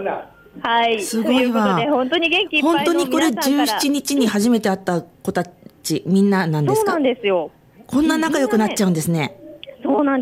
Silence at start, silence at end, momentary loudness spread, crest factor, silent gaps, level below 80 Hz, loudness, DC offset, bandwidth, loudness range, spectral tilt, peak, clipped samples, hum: 0 s; 0 s; 10 LU; 12 dB; none; -56 dBFS; -18 LUFS; under 0.1%; 16.5 kHz; 3 LU; -5 dB/octave; -6 dBFS; under 0.1%; none